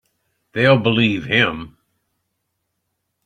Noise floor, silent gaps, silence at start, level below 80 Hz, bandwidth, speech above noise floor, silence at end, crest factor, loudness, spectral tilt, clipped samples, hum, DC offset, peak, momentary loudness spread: -74 dBFS; none; 0.55 s; -54 dBFS; 9.8 kHz; 58 dB; 1.55 s; 20 dB; -16 LUFS; -7 dB/octave; under 0.1%; none; under 0.1%; -2 dBFS; 12 LU